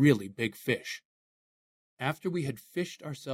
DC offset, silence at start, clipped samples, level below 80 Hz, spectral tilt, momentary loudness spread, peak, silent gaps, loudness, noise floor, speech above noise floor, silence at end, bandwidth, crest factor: under 0.1%; 0 s; under 0.1%; -70 dBFS; -6 dB/octave; 10 LU; -10 dBFS; 1.05-1.97 s; -33 LUFS; under -90 dBFS; over 60 dB; 0 s; 16 kHz; 22 dB